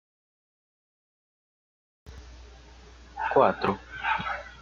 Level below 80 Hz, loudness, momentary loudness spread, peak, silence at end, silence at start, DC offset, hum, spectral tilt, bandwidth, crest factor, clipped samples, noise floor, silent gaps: -52 dBFS; -27 LUFS; 25 LU; -8 dBFS; 0 s; 2.05 s; under 0.1%; none; -6 dB/octave; 7.4 kHz; 24 dB; under 0.1%; -50 dBFS; none